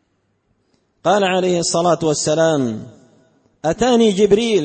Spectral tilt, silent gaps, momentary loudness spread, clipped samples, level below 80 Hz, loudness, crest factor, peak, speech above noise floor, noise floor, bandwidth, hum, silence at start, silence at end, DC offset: -4.5 dB/octave; none; 9 LU; under 0.1%; -50 dBFS; -16 LUFS; 16 dB; -2 dBFS; 50 dB; -65 dBFS; 8.8 kHz; none; 1.05 s; 0 s; under 0.1%